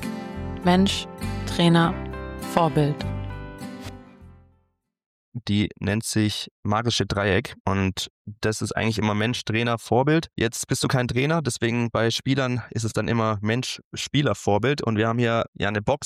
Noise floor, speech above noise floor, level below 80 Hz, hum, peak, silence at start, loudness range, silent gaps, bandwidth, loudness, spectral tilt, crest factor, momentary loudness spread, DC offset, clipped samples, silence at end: -69 dBFS; 46 dB; -46 dBFS; none; -6 dBFS; 0 s; 6 LU; 5.06-5.32 s, 6.51-6.63 s, 7.60-7.65 s, 8.10-8.25 s, 13.85-13.91 s, 15.48-15.53 s; 15 kHz; -24 LUFS; -5 dB/octave; 18 dB; 12 LU; under 0.1%; under 0.1%; 0 s